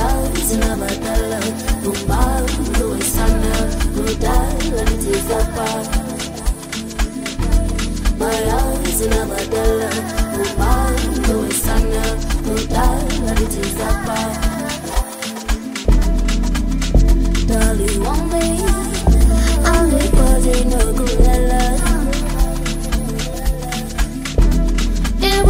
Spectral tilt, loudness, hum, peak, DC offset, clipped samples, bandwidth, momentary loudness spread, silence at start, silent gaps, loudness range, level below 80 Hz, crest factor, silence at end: -4.5 dB/octave; -18 LUFS; none; 0 dBFS; under 0.1%; under 0.1%; 16.5 kHz; 7 LU; 0 s; none; 4 LU; -18 dBFS; 14 dB; 0 s